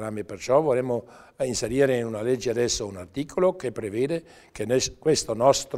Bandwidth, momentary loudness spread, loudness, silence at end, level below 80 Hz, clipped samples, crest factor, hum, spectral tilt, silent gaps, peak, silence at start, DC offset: 16 kHz; 11 LU; -25 LUFS; 0 s; -52 dBFS; under 0.1%; 20 dB; none; -4.5 dB/octave; none; -6 dBFS; 0 s; under 0.1%